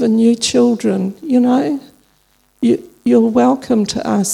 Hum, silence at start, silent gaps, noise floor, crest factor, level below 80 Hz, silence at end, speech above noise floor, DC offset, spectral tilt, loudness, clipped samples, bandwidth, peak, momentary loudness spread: none; 0 s; none; -57 dBFS; 14 dB; -54 dBFS; 0 s; 43 dB; under 0.1%; -5 dB/octave; -15 LUFS; under 0.1%; 13.5 kHz; 0 dBFS; 6 LU